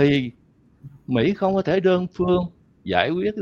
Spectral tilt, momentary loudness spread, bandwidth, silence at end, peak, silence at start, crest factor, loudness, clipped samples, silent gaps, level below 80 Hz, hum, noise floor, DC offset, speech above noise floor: -8 dB/octave; 14 LU; 7 kHz; 0 s; -2 dBFS; 0 s; 20 dB; -21 LUFS; under 0.1%; none; -50 dBFS; none; -47 dBFS; under 0.1%; 26 dB